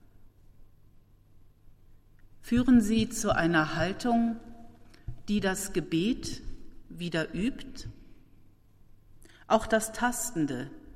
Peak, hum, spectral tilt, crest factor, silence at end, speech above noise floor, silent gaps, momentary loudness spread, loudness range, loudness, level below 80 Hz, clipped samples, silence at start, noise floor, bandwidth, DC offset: -10 dBFS; none; -4.5 dB/octave; 20 dB; 0.05 s; 29 dB; none; 20 LU; 7 LU; -28 LUFS; -48 dBFS; under 0.1%; 0.2 s; -57 dBFS; 16 kHz; under 0.1%